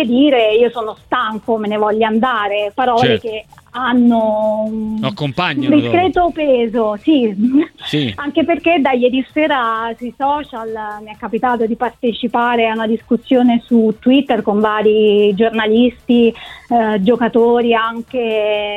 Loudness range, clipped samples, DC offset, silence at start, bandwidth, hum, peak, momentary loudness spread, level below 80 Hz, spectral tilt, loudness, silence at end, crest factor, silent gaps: 4 LU; under 0.1%; under 0.1%; 0 s; 7.8 kHz; none; 0 dBFS; 8 LU; -48 dBFS; -7 dB/octave; -15 LUFS; 0 s; 14 dB; none